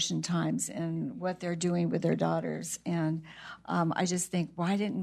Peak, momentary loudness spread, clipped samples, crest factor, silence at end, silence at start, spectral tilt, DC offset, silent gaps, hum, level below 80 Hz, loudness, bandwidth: -14 dBFS; 6 LU; under 0.1%; 18 dB; 0 s; 0 s; -5 dB/octave; under 0.1%; none; none; -70 dBFS; -32 LUFS; 13.5 kHz